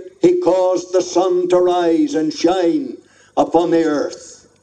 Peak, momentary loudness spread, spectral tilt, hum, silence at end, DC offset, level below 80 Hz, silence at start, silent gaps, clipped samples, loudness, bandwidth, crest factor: -2 dBFS; 8 LU; -5 dB/octave; none; 0.3 s; under 0.1%; -56 dBFS; 0 s; none; under 0.1%; -16 LUFS; 9 kHz; 14 dB